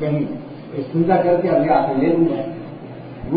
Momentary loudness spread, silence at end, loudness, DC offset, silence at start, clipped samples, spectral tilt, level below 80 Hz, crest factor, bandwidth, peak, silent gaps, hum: 17 LU; 0 s; -18 LUFS; under 0.1%; 0 s; under 0.1%; -13 dB/octave; -50 dBFS; 16 dB; 5 kHz; -2 dBFS; none; none